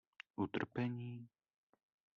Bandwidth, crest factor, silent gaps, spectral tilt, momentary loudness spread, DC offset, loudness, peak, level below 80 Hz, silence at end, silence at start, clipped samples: 6.8 kHz; 22 dB; none; -6 dB/octave; 13 LU; under 0.1%; -43 LUFS; -24 dBFS; -80 dBFS; 0.9 s; 0.4 s; under 0.1%